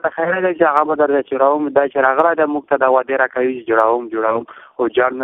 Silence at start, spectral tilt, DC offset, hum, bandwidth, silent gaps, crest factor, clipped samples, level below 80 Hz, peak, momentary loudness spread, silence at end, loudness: 0.05 s; -7.5 dB/octave; under 0.1%; none; 3.9 kHz; none; 16 dB; under 0.1%; -62 dBFS; 0 dBFS; 5 LU; 0 s; -16 LUFS